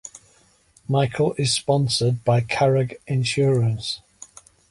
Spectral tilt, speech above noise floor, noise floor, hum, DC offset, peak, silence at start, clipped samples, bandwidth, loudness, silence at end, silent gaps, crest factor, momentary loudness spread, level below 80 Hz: -5 dB/octave; 37 dB; -58 dBFS; none; under 0.1%; -6 dBFS; 0.05 s; under 0.1%; 11.5 kHz; -21 LUFS; 0.45 s; none; 16 dB; 9 LU; -54 dBFS